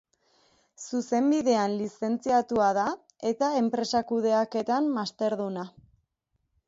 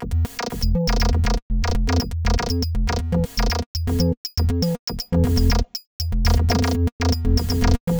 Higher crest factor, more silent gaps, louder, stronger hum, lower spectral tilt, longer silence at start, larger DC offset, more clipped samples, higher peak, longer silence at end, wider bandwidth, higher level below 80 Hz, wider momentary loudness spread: about the same, 16 dB vs 14 dB; second, none vs 1.42-1.50 s, 3.66-3.74 s, 4.17-4.24 s, 4.79-4.87 s, 5.87-5.99 s, 6.92-6.99 s, 7.80-7.87 s; second, -27 LUFS vs -22 LUFS; neither; about the same, -5 dB/octave vs -6 dB/octave; first, 0.8 s vs 0 s; neither; neither; second, -12 dBFS vs -6 dBFS; first, 1 s vs 0 s; second, 8 kHz vs over 20 kHz; second, -68 dBFS vs -24 dBFS; first, 9 LU vs 5 LU